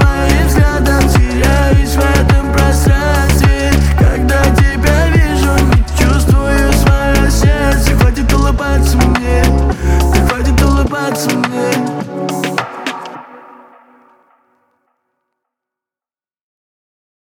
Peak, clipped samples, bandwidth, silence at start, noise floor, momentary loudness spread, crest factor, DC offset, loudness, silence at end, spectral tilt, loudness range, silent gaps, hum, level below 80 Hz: 0 dBFS; under 0.1%; 17 kHz; 0 s; under -90 dBFS; 6 LU; 12 dB; under 0.1%; -12 LUFS; 3.95 s; -5.5 dB/octave; 9 LU; none; none; -14 dBFS